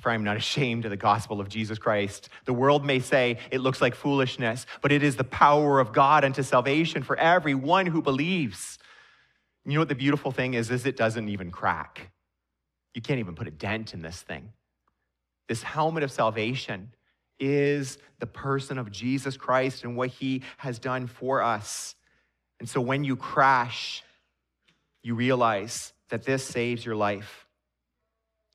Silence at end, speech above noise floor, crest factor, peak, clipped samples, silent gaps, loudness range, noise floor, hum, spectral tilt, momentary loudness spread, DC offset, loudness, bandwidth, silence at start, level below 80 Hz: 1.15 s; 57 dB; 22 dB; -4 dBFS; under 0.1%; none; 9 LU; -83 dBFS; none; -5.5 dB/octave; 15 LU; under 0.1%; -26 LUFS; 14 kHz; 0 s; -62 dBFS